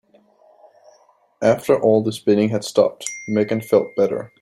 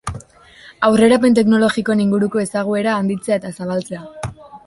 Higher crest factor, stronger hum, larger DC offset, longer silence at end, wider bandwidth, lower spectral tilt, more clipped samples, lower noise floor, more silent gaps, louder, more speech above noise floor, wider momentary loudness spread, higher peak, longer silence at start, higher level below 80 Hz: about the same, 18 dB vs 16 dB; neither; neither; about the same, 0.15 s vs 0.1 s; first, 16 kHz vs 11.5 kHz; about the same, -5.5 dB/octave vs -6 dB/octave; neither; first, -56 dBFS vs -44 dBFS; neither; second, -19 LUFS vs -16 LUFS; first, 38 dB vs 28 dB; second, 5 LU vs 18 LU; about the same, -2 dBFS vs -2 dBFS; first, 1.4 s vs 0.05 s; second, -64 dBFS vs -46 dBFS